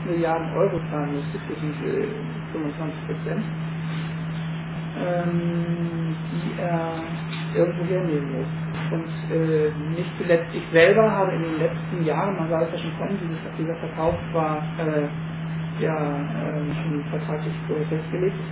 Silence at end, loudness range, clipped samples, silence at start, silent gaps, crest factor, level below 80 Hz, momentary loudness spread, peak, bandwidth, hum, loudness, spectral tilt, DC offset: 0 s; 7 LU; under 0.1%; 0 s; none; 22 dB; -52 dBFS; 7 LU; -4 dBFS; 4 kHz; none; -25 LUFS; -11.5 dB/octave; under 0.1%